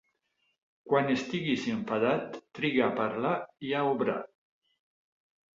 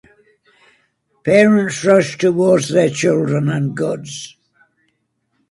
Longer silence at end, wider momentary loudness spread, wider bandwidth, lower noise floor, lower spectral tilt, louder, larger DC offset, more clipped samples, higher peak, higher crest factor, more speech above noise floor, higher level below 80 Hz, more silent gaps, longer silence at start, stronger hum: about the same, 1.3 s vs 1.2 s; second, 7 LU vs 14 LU; second, 7.6 kHz vs 11.5 kHz; first, -77 dBFS vs -68 dBFS; about the same, -6 dB/octave vs -6 dB/octave; second, -30 LUFS vs -15 LUFS; neither; neither; second, -12 dBFS vs 0 dBFS; about the same, 20 dB vs 16 dB; second, 47 dB vs 53 dB; second, -72 dBFS vs -58 dBFS; neither; second, 0.85 s vs 1.25 s; neither